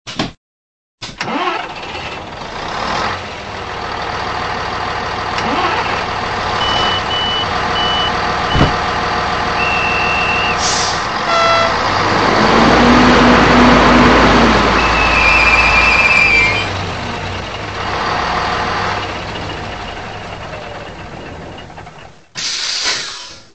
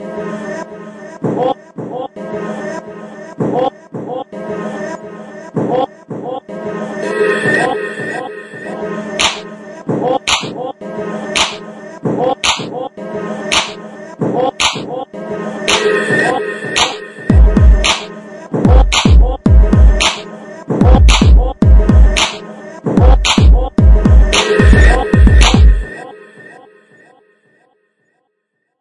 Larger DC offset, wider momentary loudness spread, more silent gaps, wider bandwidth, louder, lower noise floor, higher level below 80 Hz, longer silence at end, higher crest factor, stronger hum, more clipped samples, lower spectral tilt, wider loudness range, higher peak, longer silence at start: first, 0.6% vs under 0.1%; about the same, 18 LU vs 18 LU; first, 0.37-0.98 s vs none; second, 9 kHz vs 11.5 kHz; about the same, -13 LUFS vs -13 LUFS; second, -37 dBFS vs -69 dBFS; second, -30 dBFS vs -14 dBFS; second, 0.15 s vs 2.4 s; about the same, 14 dB vs 12 dB; neither; neither; about the same, -4 dB/octave vs -5 dB/octave; about the same, 13 LU vs 11 LU; about the same, 0 dBFS vs 0 dBFS; about the same, 0.05 s vs 0 s